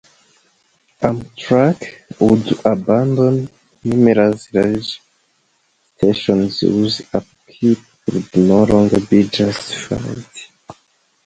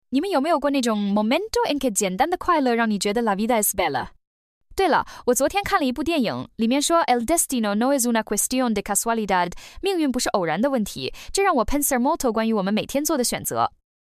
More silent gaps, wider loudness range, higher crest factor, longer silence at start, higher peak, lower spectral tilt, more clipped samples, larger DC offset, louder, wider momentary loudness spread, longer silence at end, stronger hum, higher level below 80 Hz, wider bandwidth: second, none vs 4.27-4.61 s; about the same, 3 LU vs 2 LU; about the same, 16 dB vs 16 dB; first, 1 s vs 0.1 s; first, 0 dBFS vs -6 dBFS; first, -7 dB/octave vs -3.5 dB/octave; neither; neither; first, -16 LUFS vs -22 LUFS; first, 14 LU vs 5 LU; first, 0.55 s vs 0.3 s; neither; about the same, -46 dBFS vs -44 dBFS; second, 9.4 kHz vs 15.5 kHz